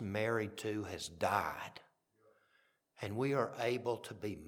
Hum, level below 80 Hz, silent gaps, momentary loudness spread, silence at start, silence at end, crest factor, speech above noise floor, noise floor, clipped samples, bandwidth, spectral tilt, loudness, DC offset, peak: none; -72 dBFS; none; 12 LU; 0 s; 0 s; 22 dB; 37 dB; -75 dBFS; under 0.1%; 19 kHz; -5.5 dB/octave; -38 LUFS; under 0.1%; -18 dBFS